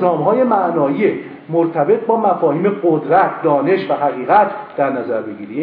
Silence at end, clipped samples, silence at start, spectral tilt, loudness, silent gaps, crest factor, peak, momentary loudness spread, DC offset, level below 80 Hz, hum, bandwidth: 0 s; under 0.1%; 0 s; -11 dB/octave; -16 LUFS; none; 16 dB; 0 dBFS; 7 LU; under 0.1%; -64 dBFS; none; 5 kHz